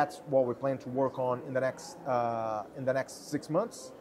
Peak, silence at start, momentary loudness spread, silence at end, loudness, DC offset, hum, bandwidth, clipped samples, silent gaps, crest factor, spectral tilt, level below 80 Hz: -14 dBFS; 0 s; 7 LU; 0 s; -32 LUFS; under 0.1%; none; 14 kHz; under 0.1%; none; 18 dB; -6 dB/octave; -72 dBFS